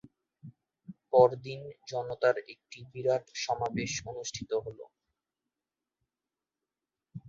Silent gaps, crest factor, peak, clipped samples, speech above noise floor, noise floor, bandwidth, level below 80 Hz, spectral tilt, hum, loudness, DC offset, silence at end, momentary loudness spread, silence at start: none; 24 dB; -8 dBFS; under 0.1%; over 59 dB; under -90 dBFS; 7.6 kHz; -66 dBFS; -4 dB/octave; none; -31 LUFS; under 0.1%; 0 s; 22 LU; 0.45 s